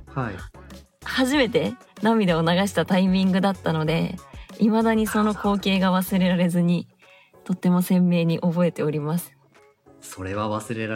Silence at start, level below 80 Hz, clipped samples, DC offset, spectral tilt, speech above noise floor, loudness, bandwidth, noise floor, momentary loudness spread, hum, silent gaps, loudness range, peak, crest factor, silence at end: 0 s; -50 dBFS; under 0.1%; under 0.1%; -6.5 dB/octave; 35 dB; -22 LUFS; 16.5 kHz; -56 dBFS; 13 LU; none; none; 3 LU; -6 dBFS; 16 dB; 0 s